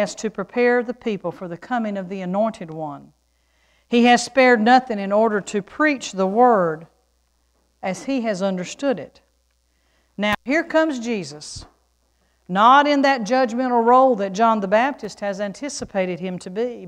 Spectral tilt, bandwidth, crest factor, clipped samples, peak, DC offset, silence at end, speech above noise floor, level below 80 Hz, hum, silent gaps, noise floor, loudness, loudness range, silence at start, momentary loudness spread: -4.5 dB/octave; 11.5 kHz; 20 dB; under 0.1%; -2 dBFS; under 0.1%; 0 s; 46 dB; -58 dBFS; none; none; -65 dBFS; -19 LUFS; 8 LU; 0 s; 15 LU